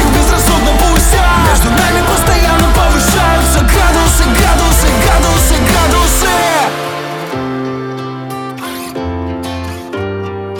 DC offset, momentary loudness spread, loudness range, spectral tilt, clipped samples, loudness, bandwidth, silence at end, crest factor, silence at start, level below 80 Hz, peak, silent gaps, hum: under 0.1%; 12 LU; 10 LU; -4 dB/octave; under 0.1%; -11 LUFS; 19.5 kHz; 0 s; 10 dB; 0 s; -14 dBFS; 0 dBFS; none; none